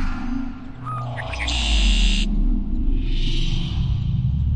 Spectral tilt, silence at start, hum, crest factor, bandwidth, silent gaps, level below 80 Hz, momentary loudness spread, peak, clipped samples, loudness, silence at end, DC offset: -4.5 dB/octave; 0 s; none; 12 dB; 9 kHz; none; -22 dBFS; 10 LU; -6 dBFS; under 0.1%; -24 LUFS; 0 s; 0.9%